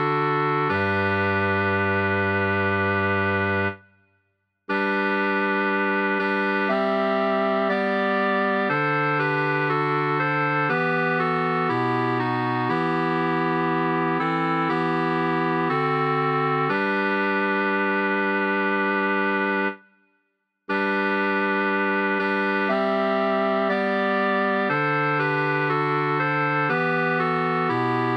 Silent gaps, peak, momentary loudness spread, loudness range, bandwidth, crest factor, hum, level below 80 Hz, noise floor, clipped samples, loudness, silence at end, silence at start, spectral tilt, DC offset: none; -10 dBFS; 1 LU; 2 LU; 8.2 kHz; 12 dB; none; -74 dBFS; -74 dBFS; under 0.1%; -22 LUFS; 0 s; 0 s; -8 dB/octave; under 0.1%